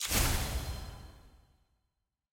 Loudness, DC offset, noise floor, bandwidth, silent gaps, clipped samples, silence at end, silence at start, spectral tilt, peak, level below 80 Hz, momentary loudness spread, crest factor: -34 LUFS; under 0.1%; -84 dBFS; 17 kHz; none; under 0.1%; 1.05 s; 0 s; -3 dB/octave; -14 dBFS; -40 dBFS; 23 LU; 22 dB